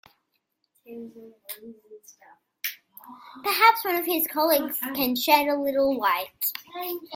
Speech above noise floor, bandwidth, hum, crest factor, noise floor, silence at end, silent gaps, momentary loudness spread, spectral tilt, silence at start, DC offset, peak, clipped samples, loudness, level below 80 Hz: 50 dB; 17 kHz; none; 22 dB; -76 dBFS; 0 s; none; 25 LU; -1.5 dB/octave; 0.9 s; under 0.1%; -4 dBFS; under 0.1%; -24 LUFS; -68 dBFS